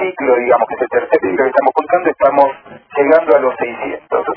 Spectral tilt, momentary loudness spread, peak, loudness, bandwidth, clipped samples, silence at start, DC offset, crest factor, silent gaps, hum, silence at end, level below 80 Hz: -8.5 dB/octave; 9 LU; 0 dBFS; -14 LUFS; 5.4 kHz; 0.2%; 0 s; under 0.1%; 14 dB; none; none; 0 s; -56 dBFS